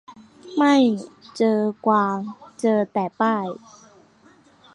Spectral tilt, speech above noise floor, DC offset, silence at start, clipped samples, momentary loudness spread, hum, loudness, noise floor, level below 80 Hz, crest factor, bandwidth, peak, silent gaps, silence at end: -6 dB/octave; 33 dB; under 0.1%; 0.1 s; under 0.1%; 14 LU; none; -21 LUFS; -54 dBFS; -72 dBFS; 18 dB; 11 kHz; -6 dBFS; none; 1.2 s